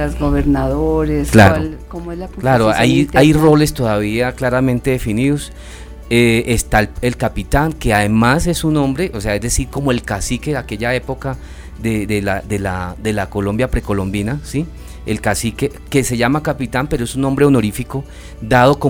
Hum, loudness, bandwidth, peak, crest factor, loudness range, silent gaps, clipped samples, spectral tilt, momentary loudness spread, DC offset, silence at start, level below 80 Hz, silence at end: none; -16 LUFS; 19.5 kHz; 0 dBFS; 16 dB; 7 LU; none; under 0.1%; -5.5 dB/octave; 13 LU; under 0.1%; 0 s; -28 dBFS; 0 s